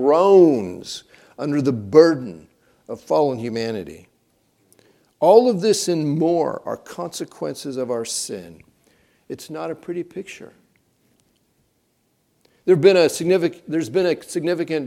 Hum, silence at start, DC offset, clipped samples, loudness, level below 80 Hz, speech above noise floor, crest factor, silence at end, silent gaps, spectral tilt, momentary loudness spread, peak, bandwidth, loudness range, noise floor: none; 0 s; under 0.1%; under 0.1%; -19 LUFS; -66 dBFS; 47 dB; 20 dB; 0 s; none; -5.5 dB/octave; 20 LU; 0 dBFS; 15 kHz; 15 LU; -66 dBFS